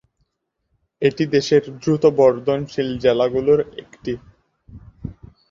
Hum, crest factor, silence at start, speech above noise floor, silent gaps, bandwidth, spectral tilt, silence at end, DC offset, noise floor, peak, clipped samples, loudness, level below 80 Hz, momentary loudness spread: none; 18 dB; 1 s; 56 dB; none; 7.4 kHz; -6.5 dB/octave; 0.4 s; under 0.1%; -74 dBFS; -2 dBFS; under 0.1%; -19 LUFS; -50 dBFS; 17 LU